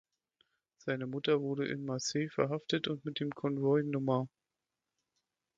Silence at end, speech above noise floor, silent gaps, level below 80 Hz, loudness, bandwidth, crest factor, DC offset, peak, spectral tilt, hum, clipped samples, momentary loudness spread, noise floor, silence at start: 1.3 s; 56 dB; none; -76 dBFS; -34 LUFS; 7.8 kHz; 18 dB; under 0.1%; -18 dBFS; -5.5 dB/octave; none; under 0.1%; 7 LU; -90 dBFS; 0.85 s